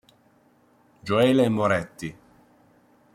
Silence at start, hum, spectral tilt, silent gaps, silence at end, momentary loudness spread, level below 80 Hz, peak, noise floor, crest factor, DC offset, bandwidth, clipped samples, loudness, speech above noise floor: 1.05 s; none; -6.5 dB/octave; none; 1.05 s; 18 LU; -62 dBFS; -6 dBFS; -60 dBFS; 20 dB; under 0.1%; 15.5 kHz; under 0.1%; -22 LUFS; 38 dB